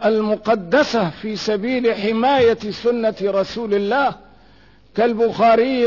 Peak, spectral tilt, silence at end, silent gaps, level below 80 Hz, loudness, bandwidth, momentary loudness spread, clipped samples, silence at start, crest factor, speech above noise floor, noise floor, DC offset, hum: -6 dBFS; -5.5 dB/octave; 0 s; none; -54 dBFS; -18 LUFS; 6 kHz; 7 LU; under 0.1%; 0 s; 12 dB; 33 dB; -50 dBFS; 0.2%; none